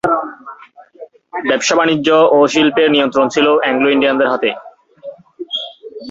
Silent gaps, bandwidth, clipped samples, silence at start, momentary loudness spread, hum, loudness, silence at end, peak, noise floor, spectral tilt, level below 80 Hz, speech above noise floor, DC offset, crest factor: none; 8 kHz; under 0.1%; 0.05 s; 23 LU; none; -13 LUFS; 0 s; 0 dBFS; -39 dBFS; -3.5 dB/octave; -58 dBFS; 27 dB; under 0.1%; 14 dB